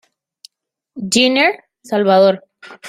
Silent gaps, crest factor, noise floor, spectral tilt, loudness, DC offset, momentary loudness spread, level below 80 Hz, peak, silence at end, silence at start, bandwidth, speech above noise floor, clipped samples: none; 16 dB; -73 dBFS; -3.5 dB/octave; -14 LUFS; under 0.1%; 16 LU; -62 dBFS; 0 dBFS; 0 s; 0.95 s; 15 kHz; 59 dB; under 0.1%